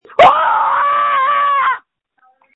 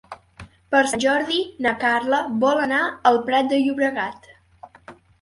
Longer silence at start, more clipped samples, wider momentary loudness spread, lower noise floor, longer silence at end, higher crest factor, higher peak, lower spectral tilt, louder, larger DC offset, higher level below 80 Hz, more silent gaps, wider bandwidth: about the same, 0.2 s vs 0.1 s; neither; about the same, 7 LU vs 5 LU; first, -57 dBFS vs -47 dBFS; first, 0.75 s vs 0.3 s; second, 14 dB vs 20 dB; about the same, 0 dBFS vs -2 dBFS; about the same, -4 dB/octave vs -3.5 dB/octave; first, -12 LUFS vs -20 LUFS; neither; about the same, -56 dBFS vs -58 dBFS; neither; second, 8.6 kHz vs 11.5 kHz